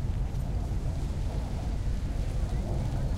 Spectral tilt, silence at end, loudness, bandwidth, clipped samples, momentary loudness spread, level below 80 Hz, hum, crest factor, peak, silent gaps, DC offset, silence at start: -7.5 dB/octave; 0 s; -33 LUFS; 12 kHz; under 0.1%; 2 LU; -32 dBFS; none; 12 dB; -18 dBFS; none; under 0.1%; 0 s